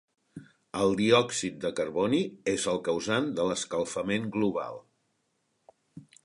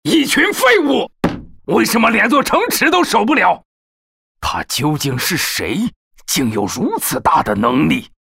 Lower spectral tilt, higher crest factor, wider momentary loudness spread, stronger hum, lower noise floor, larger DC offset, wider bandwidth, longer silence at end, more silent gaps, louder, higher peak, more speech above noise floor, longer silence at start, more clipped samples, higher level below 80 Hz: about the same, -4.5 dB/octave vs -3.5 dB/octave; first, 22 dB vs 12 dB; about the same, 9 LU vs 10 LU; neither; second, -76 dBFS vs under -90 dBFS; neither; second, 11.5 kHz vs 16.5 kHz; about the same, 0.2 s vs 0.25 s; second, none vs 3.65-4.35 s, 5.96-6.11 s; second, -28 LUFS vs -15 LUFS; second, -8 dBFS vs -2 dBFS; second, 48 dB vs over 75 dB; first, 0.35 s vs 0.05 s; neither; second, -64 dBFS vs -42 dBFS